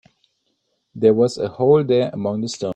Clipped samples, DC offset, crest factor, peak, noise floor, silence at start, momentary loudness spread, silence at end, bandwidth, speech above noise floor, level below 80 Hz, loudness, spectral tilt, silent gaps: under 0.1%; under 0.1%; 16 dB; -2 dBFS; -70 dBFS; 0.95 s; 8 LU; 0 s; 9.4 kHz; 53 dB; -60 dBFS; -18 LUFS; -6.5 dB/octave; none